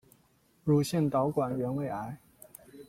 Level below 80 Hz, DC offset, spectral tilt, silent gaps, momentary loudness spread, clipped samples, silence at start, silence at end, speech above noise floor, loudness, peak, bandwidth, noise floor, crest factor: -64 dBFS; under 0.1%; -7 dB/octave; none; 23 LU; under 0.1%; 0.65 s; 0.05 s; 38 dB; -30 LUFS; -14 dBFS; 16.5 kHz; -67 dBFS; 18 dB